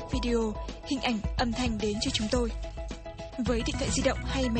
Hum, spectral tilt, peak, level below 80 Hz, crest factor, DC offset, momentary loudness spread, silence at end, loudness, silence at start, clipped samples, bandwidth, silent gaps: none; -4.5 dB/octave; -12 dBFS; -36 dBFS; 18 dB; under 0.1%; 11 LU; 0 s; -30 LUFS; 0 s; under 0.1%; 9.4 kHz; none